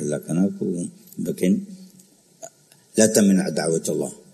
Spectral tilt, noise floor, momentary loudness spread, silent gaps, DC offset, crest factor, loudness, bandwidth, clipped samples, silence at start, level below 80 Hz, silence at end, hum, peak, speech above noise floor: -5 dB/octave; -53 dBFS; 24 LU; none; under 0.1%; 22 dB; -22 LUFS; 13.5 kHz; under 0.1%; 0 s; -66 dBFS; 0.15 s; none; -2 dBFS; 32 dB